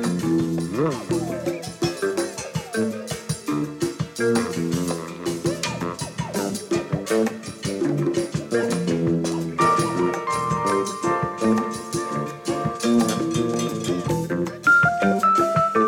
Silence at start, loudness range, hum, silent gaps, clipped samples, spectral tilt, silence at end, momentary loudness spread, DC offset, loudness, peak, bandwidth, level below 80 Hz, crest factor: 0 s; 4 LU; none; none; under 0.1%; -5.5 dB/octave; 0 s; 9 LU; under 0.1%; -23 LUFS; -6 dBFS; 17.5 kHz; -52 dBFS; 16 dB